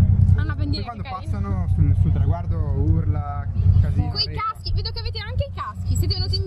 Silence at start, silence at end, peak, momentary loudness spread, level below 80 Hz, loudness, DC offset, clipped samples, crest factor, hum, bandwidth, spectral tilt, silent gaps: 0 s; 0 s; -4 dBFS; 9 LU; -28 dBFS; -22 LUFS; under 0.1%; under 0.1%; 16 dB; none; 12 kHz; -7 dB/octave; none